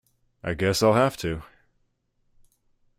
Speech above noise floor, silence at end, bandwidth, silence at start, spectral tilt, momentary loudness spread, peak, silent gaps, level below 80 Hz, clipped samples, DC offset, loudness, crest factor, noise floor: 48 dB; 1.55 s; 16 kHz; 0.45 s; -5 dB/octave; 16 LU; -8 dBFS; none; -52 dBFS; under 0.1%; under 0.1%; -23 LUFS; 20 dB; -71 dBFS